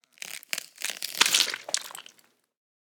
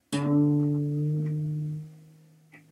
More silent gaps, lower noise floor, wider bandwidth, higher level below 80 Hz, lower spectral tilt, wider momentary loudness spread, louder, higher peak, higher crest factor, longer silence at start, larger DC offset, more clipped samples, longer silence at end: neither; first, -62 dBFS vs -55 dBFS; first, over 20 kHz vs 11.5 kHz; second, -90 dBFS vs -68 dBFS; second, 2.5 dB/octave vs -8 dB/octave; first, 19 LU vs 13 LU; about the same, -26 LUFS vs -27 LUFS; first, -2 dBFS vs -14 dBFS; first, 30 dB vs 14 dB; first, 0.25 s vs 0.1 s; neither; neither; first, 0.85 s vs 0.15 s